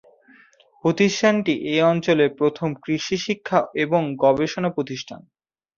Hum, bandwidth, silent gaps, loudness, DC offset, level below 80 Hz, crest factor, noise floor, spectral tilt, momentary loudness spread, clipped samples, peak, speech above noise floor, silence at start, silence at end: none; 7.4 kHz; none; -21 LUFS; under 0.1%; -60 dBFS; 18 dB; -54 dBFS; -5.5 dB/octave; 9 LU; under 0.1%; -4 dBFS; 33 dB; 0.85 s; 0.6 s